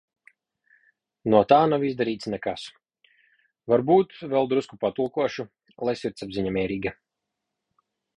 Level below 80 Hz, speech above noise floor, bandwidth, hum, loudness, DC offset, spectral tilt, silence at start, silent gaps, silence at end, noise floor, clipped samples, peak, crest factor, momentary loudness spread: -58 dBFS; 60 dB; 10.5 kHz; none; -24 LUFS; under 0.1%; -7 dB/octave; 1.25 s; none; 1.25 s; -84 dBFS; under 0.1%; -4 dBFS; 22 dB; 15 LU